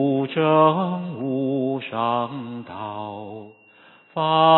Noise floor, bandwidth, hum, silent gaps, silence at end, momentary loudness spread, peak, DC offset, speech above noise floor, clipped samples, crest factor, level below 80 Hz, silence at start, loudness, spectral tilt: -52 dBFS; 4.3 kHz; none; none; 0 s; 17 LU; -2 dBFS; under 0.1%; 31 dB; under 0.1%; 20 dB; -70 dBFS; 0 s; -23 LUFS; -11 dB/octave